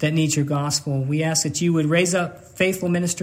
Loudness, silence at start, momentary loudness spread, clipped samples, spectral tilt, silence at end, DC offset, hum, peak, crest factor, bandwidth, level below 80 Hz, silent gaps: -21 LUFS; 0 s; 4 LU; under 0.1%; -4.5 dB/octave; 0 s; under 0.1%; none; -6 dBFS; 14 dB; 16 kHz; -58 dBFS; none